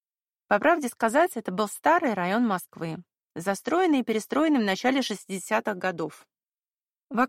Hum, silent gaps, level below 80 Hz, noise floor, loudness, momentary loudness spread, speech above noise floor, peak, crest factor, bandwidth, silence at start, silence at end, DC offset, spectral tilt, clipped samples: none; none; -74 dBFS; under -90 dBFS; -26 LUFS; 12 LU; over 65 dB; -8 dBFS; 18 dB; 16 kHz; 0.5 s; 0 s; under 0.1%; -4.5 dB/octave; under 0.1%